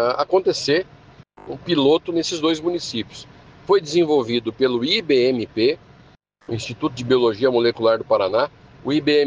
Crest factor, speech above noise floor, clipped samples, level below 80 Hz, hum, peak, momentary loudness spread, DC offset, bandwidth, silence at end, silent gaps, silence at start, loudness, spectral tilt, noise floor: 16 dB; 32 dB; under 0.1%; -56 dBFS; none; -4 dBFS; 13 LU; under 0.1%; 9.6 kHz; 0 s; none; 0 s; -20 LUFS; -5 dB/octave; -52 dBFS